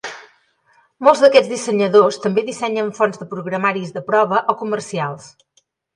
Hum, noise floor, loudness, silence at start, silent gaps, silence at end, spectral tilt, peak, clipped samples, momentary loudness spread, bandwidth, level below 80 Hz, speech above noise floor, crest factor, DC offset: none; -58 dBFS; -17 LUFS; 0.05 s; none; 0.7 s; -5 dB/octave; 0 dBFS; under 0.1%; 13 LU; 11 kHz; -68 dBFS; 41 dB; 18 dB; under 0.1%